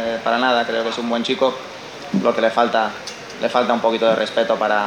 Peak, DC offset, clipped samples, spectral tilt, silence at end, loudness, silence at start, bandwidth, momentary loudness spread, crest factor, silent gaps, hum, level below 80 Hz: 0 dBFS; under 0.1%; under 0.1%; -4.5 dB/octave; 0 s; -19 LUFS; 0 s; 11 kHz; 12 LU; 18 dB; none; none; -62 dBFS